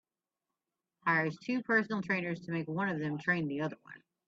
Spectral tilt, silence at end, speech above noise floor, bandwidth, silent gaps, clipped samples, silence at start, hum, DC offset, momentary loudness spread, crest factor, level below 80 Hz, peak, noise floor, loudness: -7 dB/octave; 0.3 s; over 56 dB; 7.6 kHz; none; under 0.1%; 1.05 s; none; under 0.1%; 7 LU; 20 dB; -78 dBFS; -16 dBFS; under -90 dBFS; -33 LUFS